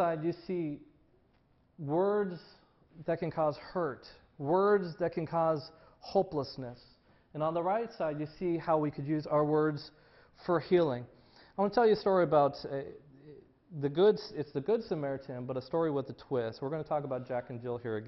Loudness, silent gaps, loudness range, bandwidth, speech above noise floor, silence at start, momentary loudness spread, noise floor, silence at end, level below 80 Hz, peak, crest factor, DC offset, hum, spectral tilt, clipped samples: -32 LUFS; none; 5 LU; 6 kHz; 37 dB; 0 s; 16 LU; -68 dBFS; 0 s; -66 dBFS; -14 dBFS; 18 dB; under 0.1%; none; -9 dB/octave; under 0.1%